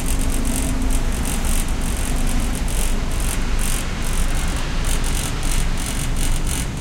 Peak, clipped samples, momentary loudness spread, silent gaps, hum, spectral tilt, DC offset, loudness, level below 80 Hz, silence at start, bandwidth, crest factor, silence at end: -4 dBFS; under 0.1%; 2 LU; none; none; -4 dB/octave; under 0.1%; -23 LUFS; -20 dBFS; 0 s; 17 kHz; 14 dB; 0 s